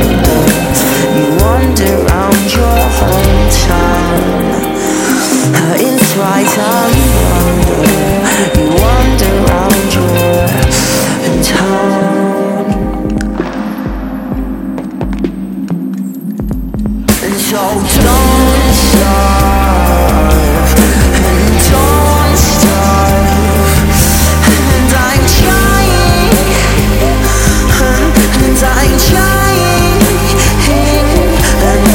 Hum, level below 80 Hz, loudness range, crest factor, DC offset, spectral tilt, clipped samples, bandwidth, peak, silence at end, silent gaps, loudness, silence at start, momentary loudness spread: none; -14 dBFS; 7 LU; 8 dB; under 0.1%; -4.5 dB/octave; 0.2%; 17.5 kHz; 0 dBFS; 0 s; none; -9 LUFS; 0 s; 9 LU